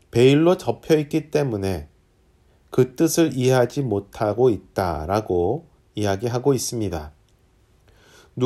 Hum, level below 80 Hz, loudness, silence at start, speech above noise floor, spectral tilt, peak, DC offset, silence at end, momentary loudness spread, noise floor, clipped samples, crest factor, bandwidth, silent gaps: none; -46 dBFS; -21 LUFS; 0.15 s; 38 dB; -6 dB/octave; -4 dBFS; under 0.1%; 0 s; 11 LU; -58 dBFS; under 0.1%; 18 dB; 15.5 kHz; none